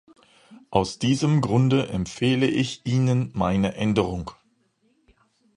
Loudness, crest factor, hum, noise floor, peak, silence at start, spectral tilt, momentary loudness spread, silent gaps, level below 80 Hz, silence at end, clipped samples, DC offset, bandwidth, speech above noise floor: -23 LUFS; 20 dB; none; -66 dBFS; -4 dBFS; 0.5 s; -6.5 dB/octave; 6 LU; none; -48 dBFS; 1.25 s; under 0.1%; under 0.1%; 11 kHz; 44 dB